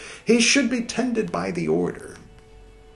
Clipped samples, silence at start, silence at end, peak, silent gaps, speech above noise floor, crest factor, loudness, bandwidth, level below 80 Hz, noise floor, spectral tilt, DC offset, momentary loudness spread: under 0.1%; 0 s; 0.3 s; -6 dBFS; none; 25 dB; 18 dB; -21 LUFS; 11.5 kHz; -52 dBFS; -47 dBFS; -3.5 dB/octave; under 0.1%; 12 LU